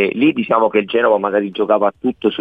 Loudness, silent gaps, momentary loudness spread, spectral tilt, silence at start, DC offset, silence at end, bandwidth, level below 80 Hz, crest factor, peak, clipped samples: -16 LUFS; none; 4 LU; -8 dB/octave; 0 s; under 0.1%; 0 s; 4.7 kHz; -60 dBFS; 14 dB; -2 dBFS; under 0.1%